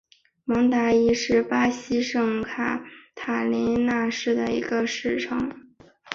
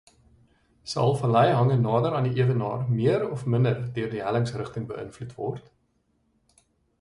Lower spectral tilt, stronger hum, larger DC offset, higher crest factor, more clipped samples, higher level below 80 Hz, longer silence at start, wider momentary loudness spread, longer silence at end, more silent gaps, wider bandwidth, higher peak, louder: second, -4.5 dB/octave vs -7.5 dB/octave; neither; neither; about the same, 18 dB vs 18 dB; neither; about the same, -54 dBFS vs -58 dBFS; second, 0.45 s vs 0.85 s; second, 9 LU vs 13 LU; second, 0 s vs 1.4 s; neither; second, 7.4 kHz vs 11 kHz; about the same, -6 dBFS vs -8 dBFS; about the same, -24 LUFS vs -25 LUFS